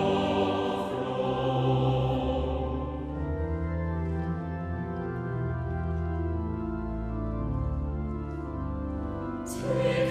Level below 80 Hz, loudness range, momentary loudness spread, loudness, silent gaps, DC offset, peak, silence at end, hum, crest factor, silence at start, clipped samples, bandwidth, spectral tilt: -38 dBFS; 4 LU; 8 LU; -31 LUFS; none; under 0.1%; -14 dBFS; 0 s; none; 14 dB; 0 s; under 0.1%; 13 kHz; -7.5 dB/octave